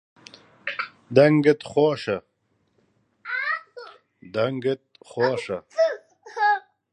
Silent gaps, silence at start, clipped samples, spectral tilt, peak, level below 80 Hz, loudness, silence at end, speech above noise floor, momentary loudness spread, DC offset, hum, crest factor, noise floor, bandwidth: none; 0.65 s; under 0.1%; -6.5 dB/octave; -2 dBFS; -68 dBFS; -23 LUFS; 0.35 s; 49 dB; 19 LU; under 0.1%; none; 22 dB; -70 dBFS; 9.8 kHz